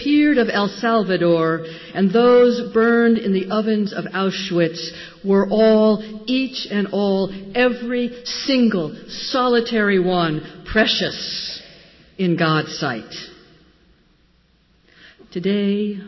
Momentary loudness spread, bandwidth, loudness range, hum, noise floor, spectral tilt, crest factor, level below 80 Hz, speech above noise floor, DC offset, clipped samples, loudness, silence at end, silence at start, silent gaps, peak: 12 LU; 6.2 kHz; 8 LU; none; -58 dBFS; -6 dB/octave; 14 dB; -50 dBFS; 39 dB; under 0.1%; under 0.1%; -19 LUFS; 0 s; 0 s; none; -6 dBFS